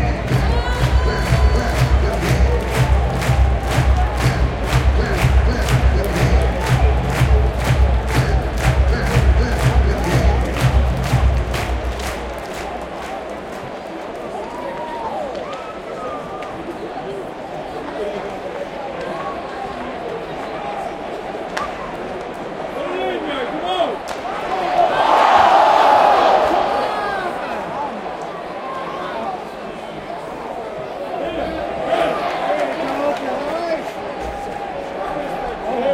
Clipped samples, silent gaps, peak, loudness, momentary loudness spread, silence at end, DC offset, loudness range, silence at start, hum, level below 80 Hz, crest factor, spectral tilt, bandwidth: under 0.1%; none; 0 dBFS; -19 LUFS; 12 LU; 0 s; under 0.1%; 12 LU; 0 s; none; -22 dBFS; 18 dB; -6 dB/octave; 15.5 kHz